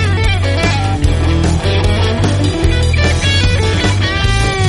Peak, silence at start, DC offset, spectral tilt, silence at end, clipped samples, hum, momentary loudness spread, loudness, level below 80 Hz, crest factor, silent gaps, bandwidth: 0 dBFS; 0 s; under 0.1%; -5 dB/octave; 0 s; under 0.1%; none; 2 LU; -13 LUFS; -20 dBFS; 12 dB; none; 11.5 kHz